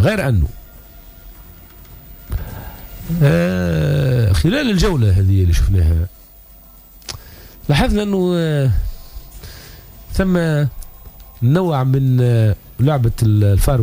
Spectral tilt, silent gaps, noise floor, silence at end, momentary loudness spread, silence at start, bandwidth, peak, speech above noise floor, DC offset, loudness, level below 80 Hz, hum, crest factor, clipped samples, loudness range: -7 dB/octave; none; -42 dBFS; 0 s; 20 LU; 0 s; 16 kHz; -4 dBFS; 28 dB; under 0.1%; -16 LUFS; -26 dBFS; none; 12 dB; under 0.1%; 5 LU